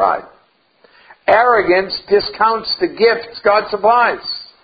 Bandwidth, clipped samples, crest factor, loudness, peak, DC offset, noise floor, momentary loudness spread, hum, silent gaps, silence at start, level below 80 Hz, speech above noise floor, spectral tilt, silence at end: 5.2 kHz; under 0.1%; 16 dB; -15 LUFS; 0 dBFS; under 0.1%; -55 dBFS; 9 LU; none; none; 0 s; -52 dBFS; 41 dB; -7 dB/octave; 0.2 s